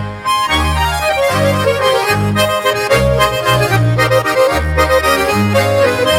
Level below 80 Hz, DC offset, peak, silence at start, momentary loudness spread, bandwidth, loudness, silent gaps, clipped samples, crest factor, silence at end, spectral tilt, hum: -26 dBFS; under 0.1%; 0 dBFS; 0 s; 2 LU; 17 kHz; -12 LUFS; none; under 0.1%; 12 dB; 0 s; -4.5 dB/octave; none